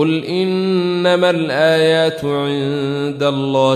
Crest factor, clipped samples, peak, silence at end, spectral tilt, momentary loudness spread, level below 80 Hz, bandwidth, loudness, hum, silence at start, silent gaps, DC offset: 14 dB; under 0.1%; -2 dBFS; 0 s; -6 dB/octave; 6 LU; -56 dBFS; 14.5 kHz; -16 LUFS; none; 0 s; none; under 0.1%